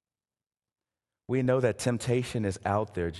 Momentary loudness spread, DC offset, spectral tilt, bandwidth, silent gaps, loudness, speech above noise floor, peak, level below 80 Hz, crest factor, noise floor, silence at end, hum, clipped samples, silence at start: 5 LU; under 0.1%; -6 dB/octave; 12.5 kHz; none; -29 LUFS; over 62 dB; -12 dBFS; -52 dBFS; 18 dB; under -90 dBFS; 0 s; none; under 0.1%; 1.3 s